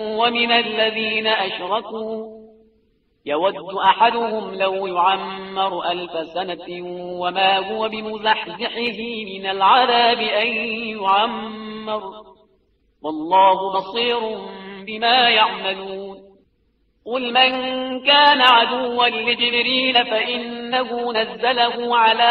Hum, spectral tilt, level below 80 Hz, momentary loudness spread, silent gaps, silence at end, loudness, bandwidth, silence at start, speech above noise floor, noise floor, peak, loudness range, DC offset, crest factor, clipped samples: none; 1 dB/octave; -62 dBFS; 15 LU; none; 0 s; -18 LUFS; 6.2 kHz; 0 s; 45 dB; -64 dBFS; 0 dBFS; 7 LU; under 0.1%; 20 dB; under 0.1%